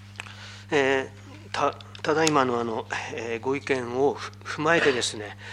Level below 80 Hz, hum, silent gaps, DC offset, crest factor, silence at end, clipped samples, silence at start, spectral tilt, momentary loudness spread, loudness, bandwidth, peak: -62 dBFS; 50 Hz at -45 dBFS; none; under 0.1%; 24 dB; 0 s; under 0.1%; 0 s; -4 dB/octave; 17 LU; -25 LUFS; 15 kHz; -2 dBFS